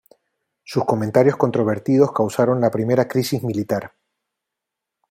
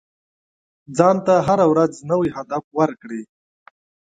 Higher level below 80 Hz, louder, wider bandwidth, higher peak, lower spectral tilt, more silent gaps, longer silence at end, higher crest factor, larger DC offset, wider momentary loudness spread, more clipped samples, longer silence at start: about the same, -60 dBFS vs -58 dBFS; about the same, -19 LUFS vs -18 LUFS; first, 16 kHz vs 9.2 kHz; about the same, -2 dBFS vs 0 dBFS; about the same, -7 dB/octave vs -7 dB/octave; second, none vs 2.64-2.71 s; first, 1.25 s vs 0.9 s; about the same, 18 dB vs 20 dB; neither; second, 7 LU vs 15 LU; neither; second, 0.7 s vs 0.9 s